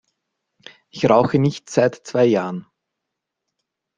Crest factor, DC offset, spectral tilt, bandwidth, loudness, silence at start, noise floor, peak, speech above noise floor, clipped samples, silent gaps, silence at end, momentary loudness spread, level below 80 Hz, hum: 20 dB; under 0.1%; -6.5 dB/octave; 9.6 kHz; -19 LUFS; 0.95 s; -81 dBFS; -2 dBFS; 63 dB; under 0.1%; none; 1.35 s; 14 LU; -58 dBFS; none